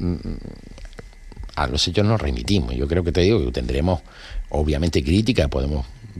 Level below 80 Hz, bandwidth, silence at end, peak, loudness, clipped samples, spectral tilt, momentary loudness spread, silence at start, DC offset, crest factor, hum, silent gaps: -30 dBFS; 13 kHz; 0 s; -4 dBFS; -21 LUFS; under 0.1%; -6 dB/octave; 20 LU; 0 s; under 0.1%; 18 dB; none; none